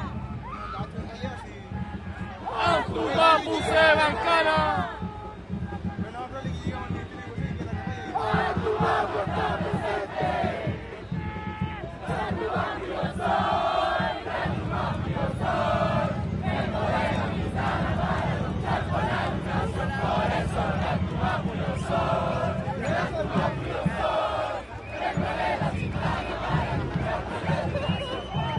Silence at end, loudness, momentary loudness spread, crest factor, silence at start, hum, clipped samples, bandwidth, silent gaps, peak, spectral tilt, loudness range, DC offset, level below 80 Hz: 0 s; -27 LUFS; 12 LU; 22 dB; 0 s; none; under 0.1%; 11.5 kHz; none; -6 dBFS; -6.5 dB/octave; 7 LU; under 0.1%; -42 dBFS